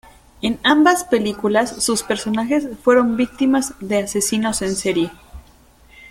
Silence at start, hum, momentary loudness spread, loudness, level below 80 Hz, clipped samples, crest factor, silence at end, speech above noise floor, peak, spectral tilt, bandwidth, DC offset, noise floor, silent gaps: 0.45 s; none; 7 LU; -18 LUFS; -48 dBFS; under 0.1%; 18 dB; 0.05 s; 32 dB; -2 dBFS; -3.5 dB/octave; 16.5 kHz; under 0.1%; -49 dBFS; none